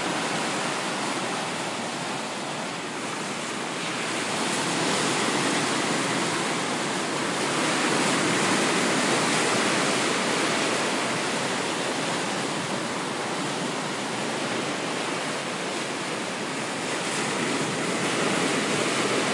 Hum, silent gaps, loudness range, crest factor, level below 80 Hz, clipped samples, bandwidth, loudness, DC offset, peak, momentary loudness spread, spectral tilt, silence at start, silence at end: none; none; 6 LU; 16 dB; -74 dBFS; under 0.1%; 11.5 kHz; -25 LUFS; under 0.1%; -12 dBFS; 7 LU; -2.5 dB/octave; 0 s; 0 s